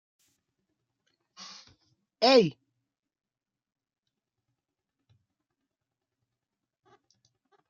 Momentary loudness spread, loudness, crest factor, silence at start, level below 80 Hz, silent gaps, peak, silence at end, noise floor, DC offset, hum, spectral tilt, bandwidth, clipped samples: 25 LU; -23 LUFS; 26 dB; 2.2 s; -80 dBFS; none; -8 dBFS; 5.2 s; -88 dBFS; under 0.1%; none; -5 dB/octave; 7.4 kHz; under 0.1%